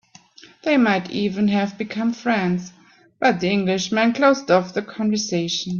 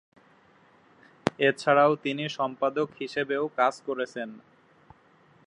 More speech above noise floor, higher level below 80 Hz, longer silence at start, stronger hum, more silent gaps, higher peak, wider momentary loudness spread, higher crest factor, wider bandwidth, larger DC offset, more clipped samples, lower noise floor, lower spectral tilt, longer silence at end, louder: second, 28 dB vs 33 dB; first, -62 dBFS vs -70 dBFS; second, 0.45 s vs 1.25 s; neither; neither; about the same, -4 dBFS vs -2 dBFS; second, 8 LU vs 11 LU; second, 16 dB vs 26 dB; second, 7.2 kHz vs 11 kHz; neither; neither; second, -48 dBFS vs -60 dBFS; about the same, -5 dB/octave vs -5.5 dB/octave; second, 0 s vs 1.1 s; first, -20 LUFS vs -27 LUFS